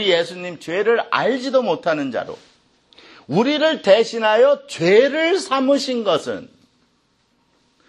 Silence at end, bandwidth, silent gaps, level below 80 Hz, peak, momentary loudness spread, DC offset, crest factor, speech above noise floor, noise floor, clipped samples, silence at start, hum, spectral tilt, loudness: 1.45 s; 11.5 kHz; none; -70 dBFS; -2 dBFS; 13 LU; under 0.1%; 18 dB; 45 dB; -63 dBFS; under 0.1%; 0 s; none; -4.5 dB/octave; -18 LUFS